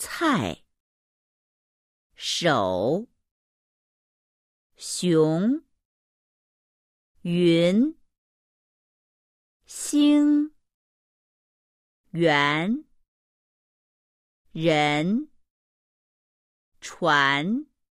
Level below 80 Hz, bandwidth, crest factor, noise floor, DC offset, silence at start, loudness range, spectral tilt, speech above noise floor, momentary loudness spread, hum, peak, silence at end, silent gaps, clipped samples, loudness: -66 dBFS; 14.5 kHz; 20 dB; under -90 dBFS; under 0.1%; 0 s; 4 LU; -5 dB/octave; over 68 dB; 17 LU; none; -8 dBFS; 0.3 s; 0.80-2.10 s, 3.31-4.70 s, 5.85-7.15 s, 8.18-9.60 s, 10.74-12.04 s, 13.08-14.45 s, 15.50-16.72 s; under 0.1%; -23 LUFS